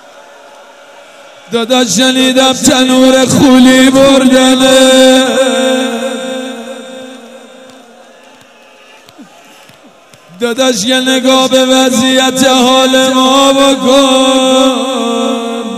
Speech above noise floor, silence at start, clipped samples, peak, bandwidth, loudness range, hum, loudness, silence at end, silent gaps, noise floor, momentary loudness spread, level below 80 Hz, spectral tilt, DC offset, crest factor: 33 dB; 1.5 s; 1%; 0 dBFS; 16 kHz; 13 LU; none; -7 LUFS; 0 s; none; -39 dBFS; 13 LU; -46 dBFS; -3 dB/octave; under 0.1%; 10 dB